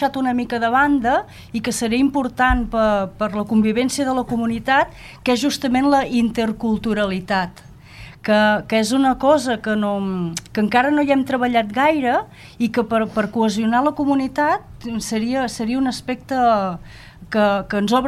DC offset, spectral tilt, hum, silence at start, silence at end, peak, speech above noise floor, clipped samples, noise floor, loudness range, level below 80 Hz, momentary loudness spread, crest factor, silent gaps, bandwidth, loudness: under 0.1%; -5 dB/octave; none; 0 s; 0 s; -2 dBFS; 21 dB; under 0.1%; -40 dBFS; 2 LU; -40 dBFS; 8 LU; 16 dB; none; 14.5 kHz; -19 LUFS